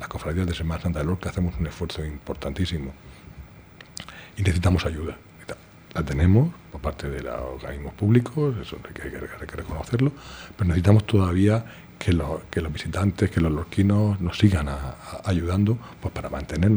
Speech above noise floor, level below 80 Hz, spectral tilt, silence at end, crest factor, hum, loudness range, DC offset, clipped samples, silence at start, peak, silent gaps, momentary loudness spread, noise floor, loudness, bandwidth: 23 dB; -38 dBFS; -7.5 dB/octave; 0 s; 22 dB; none; 6 LU; under 0.1%; under 0.1%; 0 s; -2 dBFS; none; 18 LU; -47 dBFS; -25 LUFS; over 20 kHz